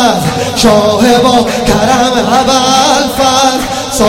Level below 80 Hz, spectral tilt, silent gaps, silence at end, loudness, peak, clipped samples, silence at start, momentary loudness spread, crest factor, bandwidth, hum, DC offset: -30 dBFS; -3.5 dB/octave; none; 0 s; -8 LUFS; 0 dBFS; 1%; 0 s; 4 LU; 8 dB; 17 kHz; none; under 0.1%